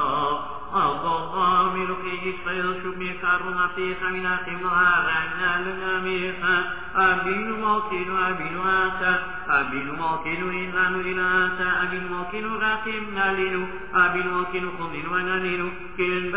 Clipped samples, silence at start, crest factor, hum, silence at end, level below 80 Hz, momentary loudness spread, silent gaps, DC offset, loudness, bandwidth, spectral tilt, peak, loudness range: under 0.1%; 0 s; 18 dB; none; 0 s; -50 dBFS; 8 LU; none; 1%; -24 LUFS; 4 kHz; -8 dB/octave; -6 dBFS; 2 LU